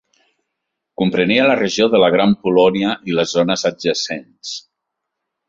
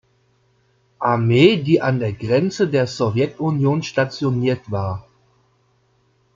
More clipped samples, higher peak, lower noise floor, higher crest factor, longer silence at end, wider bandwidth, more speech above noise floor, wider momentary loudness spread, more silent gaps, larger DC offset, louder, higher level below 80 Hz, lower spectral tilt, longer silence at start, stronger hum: neither; about the same, -2 dBFS vs -2 dBFS; first, -78 dBFS vs -61 dBFS; about the same, 16 dB vs 18 dB; second, 0.9 s vs 1.35 s; about the same, 7.8 kHz vs 7.6 kHz; first, 62 dB vs 43 dB; first, 15 LU vs 10 LU; neither; neither; first, -16 LUFS vs -19 LUFS; about the same, -56 dBFS vs -56 dBFS; second, -4.5 dB/octave vs -7 dB/octave; about the same, 1 s vs 1 s; neither